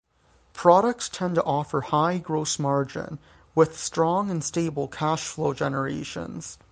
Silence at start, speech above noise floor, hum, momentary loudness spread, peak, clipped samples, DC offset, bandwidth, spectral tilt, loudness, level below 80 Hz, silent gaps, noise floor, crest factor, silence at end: 0.55 s; 37 dB; none; 14 LU; -2 dBFS; under 0.1%; under 0.1%; 10 kHz; -5 dB/octave; -25 LUFS; -58 dBFS; none; -61 dBFS; 22 dB; 0.15 s